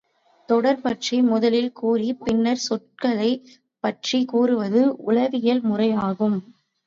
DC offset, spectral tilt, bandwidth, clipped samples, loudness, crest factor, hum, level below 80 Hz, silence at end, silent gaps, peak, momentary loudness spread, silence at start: under 0.1%; -5.5 dB/octave; 7.6 kHz; under 0.1%; -22 LUFS; 16 dB; none; -62 dBFS; 0.45 s; none; -6 dBFS; 5 LU; 0.5 s